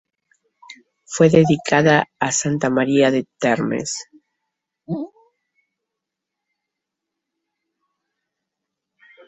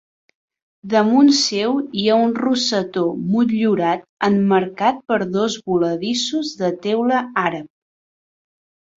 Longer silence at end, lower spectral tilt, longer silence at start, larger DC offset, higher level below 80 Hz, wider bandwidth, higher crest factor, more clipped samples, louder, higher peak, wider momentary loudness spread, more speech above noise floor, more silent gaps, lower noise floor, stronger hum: first, 4.2 s vs 1.3 s; about the same, -5 dB/octave vs -4.5 dB/octave; second, 0.7 s vs 0.85 s; neither; about the same, -58 dBFS vs -62 dBFS; about the same, 8.4 kHz vs 8 kHz; about the same, 20 dB vs 16 dB; neither; about the same, -18 LUFS vs -18 LUFS; about the same, -2 dBFS vs -2 dBFS; first, 15 LU vs 7 LU; second, 66 dB vs over 72 dB; second, none vs 4.09-4.17 s; second, -83 dBFS vs under -90 dBFS; neither